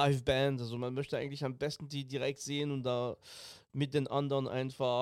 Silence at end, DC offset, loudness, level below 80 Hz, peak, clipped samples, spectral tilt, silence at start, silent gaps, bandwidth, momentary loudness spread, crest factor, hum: 0 s; under 0.1%; -35 LUFS; -62 dBFS; -14 dBFS; under 0.1%; -6 dB/octave; 0 s; none; 13.5 kHz; 9 LU; 20 dB; none